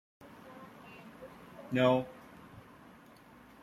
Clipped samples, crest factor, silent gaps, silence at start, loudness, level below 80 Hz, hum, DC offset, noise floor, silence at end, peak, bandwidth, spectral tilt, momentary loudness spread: under 0.1%; 24 dB; none; 0.45 s; -31 LUFS; -70 dBFS; none; under 0.1%; -57 dBFS; 1 s; -14 dBFS; 14 kHz; -7 dB/octave; 28 LU